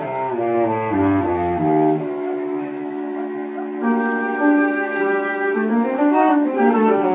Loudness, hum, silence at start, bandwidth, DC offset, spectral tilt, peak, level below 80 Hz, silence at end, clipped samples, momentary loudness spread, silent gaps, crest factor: -19 LUFS; none; 0 s; 4 kHz; under 0.1%; -11 dB/octave; -4 dBFS; -48 dBFS; 0 s; under 0.1%; 10 LU; none; 16 dB